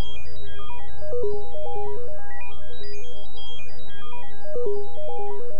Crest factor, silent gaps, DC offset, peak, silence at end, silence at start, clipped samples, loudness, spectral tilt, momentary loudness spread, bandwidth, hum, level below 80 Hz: 16 dB; none; 30%; -8 dBFS; 0 s; 0 s; under 0.1%; -35 LUFS; -6.5 dB/octave; 12 LU; 7 kHz; 50 Hz at -60 dBFS; -48 dBFS